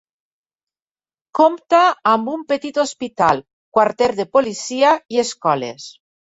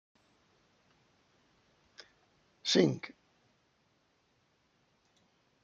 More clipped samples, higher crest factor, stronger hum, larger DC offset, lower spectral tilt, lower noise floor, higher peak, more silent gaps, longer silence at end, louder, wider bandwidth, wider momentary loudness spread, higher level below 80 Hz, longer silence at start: neither; second, 18 dB vs 28 dB; neither; neither; about the same, -4 dB/octave vs -4.5 dB/octave; first, under -90 dBFS vs -74 dBFS; first, -2 dBFS vs -12 dBFS; first, 3.53-3.72 s vs none; second, 0.3 s vs 2.55 s; first, -18 LUFS vs -31 LUFS; about the same, 8 kHz vs 8.4 kHz; second, 9 LU vs 28 LU; first, -60 dBFS vs -80 dBFS; second, 1.35 s vs 2.65 s